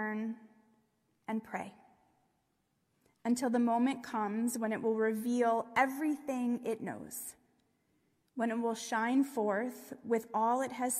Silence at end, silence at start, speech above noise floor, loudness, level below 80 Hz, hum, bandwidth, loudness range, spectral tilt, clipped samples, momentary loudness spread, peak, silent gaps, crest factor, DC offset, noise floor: 0 s; 0 s; 45 dB; -34 LUFS; -82 dBFS; none; 15.5 kHz; 6 LU; -4.5 dB/octave; under 0.1%; 12 LU; -16 dBFS; none; 18 dB; under 0.1%; -79 dBFS